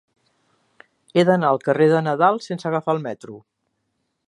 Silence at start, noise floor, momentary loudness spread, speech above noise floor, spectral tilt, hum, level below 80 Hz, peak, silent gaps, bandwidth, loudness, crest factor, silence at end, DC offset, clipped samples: 1.15 s; -74 dBFS; 12 LU; 55 dB; -7 dB/octave; none; -70 dBFS; -4 dBFS; none; 11 kHz; -19 LUFS; 18 dB; 0.9 s; under 0.1%; under 0.1%